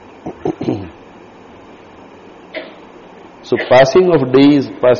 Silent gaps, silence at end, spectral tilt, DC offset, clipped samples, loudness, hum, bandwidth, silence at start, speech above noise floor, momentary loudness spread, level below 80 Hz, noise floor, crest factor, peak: none; 0 s; -5 dB/octave; under 0.1%; under 0.1%; -12 LUFS; none; 7 kHz; 0.25 s; 29 dB; 21 LU; -48 dBFS; -39 dBFS; 14 dB; 0 dBFS